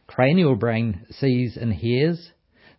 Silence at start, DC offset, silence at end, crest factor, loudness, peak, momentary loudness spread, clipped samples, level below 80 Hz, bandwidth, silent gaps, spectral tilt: 0.1 s; under 0.1%; 0.55 s; 18 dB; -22 LUFS; -4 dBFS; 8 LU; under 0.1%; -46 dBFS; 5.8 kHz; none; -12 dB/octave